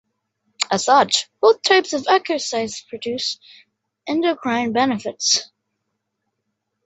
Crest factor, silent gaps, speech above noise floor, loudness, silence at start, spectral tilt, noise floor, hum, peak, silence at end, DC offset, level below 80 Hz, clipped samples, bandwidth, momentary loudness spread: 20 dB; none; 57 dB; -19 LUFS; 0.6 s; -2 dB/octave; -76 dBFS; none; -2 dBFS; 1.4 s; under 0.1%; -68 dBFS; under 0.1%; 8.4 kHz; 11 LU